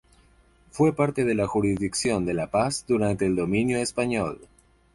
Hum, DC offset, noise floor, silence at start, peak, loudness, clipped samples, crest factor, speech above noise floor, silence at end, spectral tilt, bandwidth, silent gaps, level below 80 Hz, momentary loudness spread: none; under 0.1%; -58 dBFS; 0.75 s; -10 dBFS; -25 LUFS; under 0.1%; 16 dB; 34 dB; 0.5 s; -5.5 dB/octave; 11.5 kHz; none; -50 dBFS; 3 LU